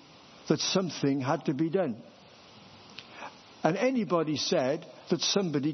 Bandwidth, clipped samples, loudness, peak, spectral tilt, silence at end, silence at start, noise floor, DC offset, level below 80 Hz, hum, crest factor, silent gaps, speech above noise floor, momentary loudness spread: 6.4 kHz; under 0.1%; -29 LUFS; -10 dBFS; -4.5 dB/octave; 0 s; 0.35 s; -53 dBFS; under 0.1%; -76 dBFS; none; 22 dB; none; 25 dB; 18 LU